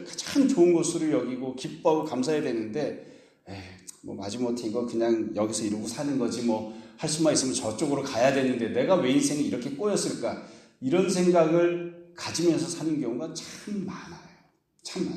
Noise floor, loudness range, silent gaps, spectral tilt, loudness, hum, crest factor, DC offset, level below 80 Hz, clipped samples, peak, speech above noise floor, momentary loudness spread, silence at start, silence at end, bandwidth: -63 dBFS; 5 LU; none; -4.5 dB/octave; -27 LUFS; none; 18 dB; under 0.1%; -68 dBFS; under 0.1%; -10 dBFS; 37 dB; 15 LU; 0 s; 0 s; 13.5 kHz